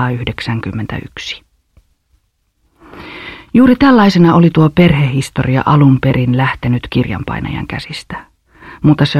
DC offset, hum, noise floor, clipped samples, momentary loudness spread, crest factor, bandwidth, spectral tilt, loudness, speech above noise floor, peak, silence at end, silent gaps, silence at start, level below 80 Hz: under 0.1%; none; -61 dBFS; under 0.1%; 20 LU; 12 dB; 12.5 kHz; -7.5 dB/octave; -12 LUFS; 49 dB; 0 dBFS; 0 s; none; 0 s; -36 dBFS